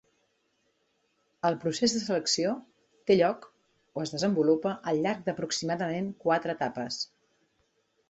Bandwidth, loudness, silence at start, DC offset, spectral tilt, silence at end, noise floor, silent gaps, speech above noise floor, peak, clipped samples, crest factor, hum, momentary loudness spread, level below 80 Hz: 8.4 kHz; -29 LUFS; 1.45 s; under 0.1%; -4.5 dB/octave; 1.05 s; -74 dBFS; none; 45 dB; -10 dBFS; under 0.1%; 20 dB; none; 11 LU; -70 dBFS